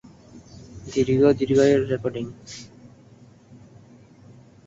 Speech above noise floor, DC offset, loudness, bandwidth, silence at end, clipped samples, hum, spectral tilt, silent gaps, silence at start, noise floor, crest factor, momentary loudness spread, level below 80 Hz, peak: 30 dB; under 0.1%; -21 LUFS; 7.8 kHz; 2 s; under 0.1%; none; -6.5 dB/octave; none; 0.35 s; -50 dBFS; 18 dB; 22 LU; -54 dBFS; -6 dBFS